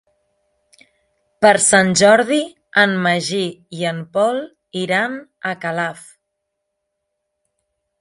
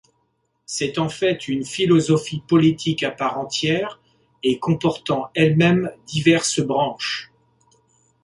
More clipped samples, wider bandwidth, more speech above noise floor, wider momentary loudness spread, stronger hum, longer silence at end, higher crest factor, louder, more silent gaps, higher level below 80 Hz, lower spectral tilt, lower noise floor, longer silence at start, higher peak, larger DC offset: neither; about the same, 11.5 kHz vs 11.5 kHz; first, 60 dB vs 49 dB; first, 14 LU vs 9 LU; neither; first, 2 s vs 1 s; about the same, 18 dB vs 18 dB; first, -17 LUFS vs -20 LUFS; neither; second, -62 dBFS vs -56 dBFS; second, -3.5 dB/octave vs -5 dB/octave; first, -76 dBFS vs -69 dBFS; first, 1.4 s vs 0.7 s; first, 0 dBFS vs -4 dBFS; neither